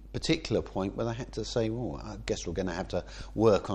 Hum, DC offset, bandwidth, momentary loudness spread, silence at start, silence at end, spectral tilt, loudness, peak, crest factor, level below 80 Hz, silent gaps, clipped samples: none; under 0.1%; 10.5 kHz; 10 LU; 0 s; 0 s; -5.5 dB/octave; -32 LUFS; -10 dBFS; 20 dB; -46 dBFS; none; under 0.1%